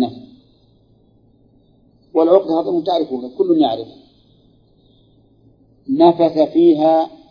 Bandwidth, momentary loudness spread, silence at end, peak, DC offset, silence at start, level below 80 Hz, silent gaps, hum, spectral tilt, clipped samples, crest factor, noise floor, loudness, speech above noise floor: 5.2 kHz; 11 LU; 0.2 s; 0 dBFS; under 0.1%; 0 s; -62 dBFS; none; none; -9 dB/octave; under 0.1%; 18 dB; -54 dBFS; -15 LUFS; 39 dB